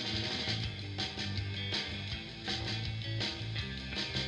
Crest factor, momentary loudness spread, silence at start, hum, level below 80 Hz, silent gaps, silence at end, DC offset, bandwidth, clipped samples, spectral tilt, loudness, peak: 18 dB; 4 LU; 0 s; none; -50 dBFS; none; 0 s; under 0.1%; 11 kHz; under 0.1%; -4 dB/octave; -36 LUFS; -20 dBFS